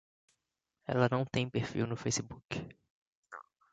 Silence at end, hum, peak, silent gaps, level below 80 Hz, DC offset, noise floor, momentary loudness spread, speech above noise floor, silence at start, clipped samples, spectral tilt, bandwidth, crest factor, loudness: 0.3 s; none; -14 dBFS; 2.45-2.49 s, 2.90-3.23 s; -64 dBFS; under 0.1%; -86 dBFS; 21 LU; 52 dB; 0.9 s; under 0.1%; -5 dB/octave; 9 kHz; 22 dB; -35 LUFS